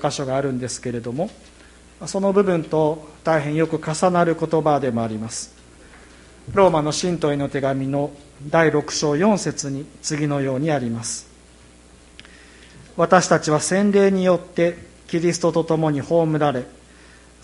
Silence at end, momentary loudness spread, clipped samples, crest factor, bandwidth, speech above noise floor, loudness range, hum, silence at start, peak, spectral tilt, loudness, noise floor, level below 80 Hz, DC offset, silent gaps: 0.75 s; 11 LU; under 0.1%; 20 dB; 11.5 kHz; 28 dB; 4 LU; none; 0 s; 0 dBFS; -5.5 dB/octave; -20 LUFS; -48 dBFS; -50 dBFS; under 0.1%; none